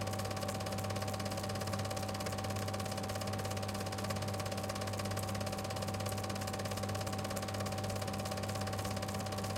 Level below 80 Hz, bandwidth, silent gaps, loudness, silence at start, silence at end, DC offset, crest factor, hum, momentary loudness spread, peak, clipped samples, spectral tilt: -58 dBFS; 17 kHz; none; -39 LUFS; 0 s; 0 s; under 0.1%; 16 dB; none; 1 LU; -22 dBFS; under 0.1%; -4.5 dB/octave